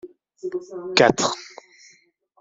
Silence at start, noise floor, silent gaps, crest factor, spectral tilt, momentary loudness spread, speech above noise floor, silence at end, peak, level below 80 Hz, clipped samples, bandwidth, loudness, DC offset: 0.05 s; -59 dBFS; none; 22 dB; -3 dB/octave; 18 LU; 38 dB; 0.95 s; -2 dBFS; -60 dBFS; under 0.1%; 7.8 kHz; -21 LUFS; under 0.1%